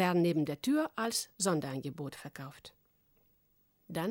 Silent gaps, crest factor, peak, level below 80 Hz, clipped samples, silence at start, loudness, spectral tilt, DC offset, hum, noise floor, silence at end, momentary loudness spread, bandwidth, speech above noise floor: none; 20 dB; -16 dBFS; -72 dBFS; under 0.1%; 0 s; -34 LUFS; -4.5 dB/octave; under 0.1%; none; -72 dBFS; 0 s; 16 LU; 19 kHz; 38 dB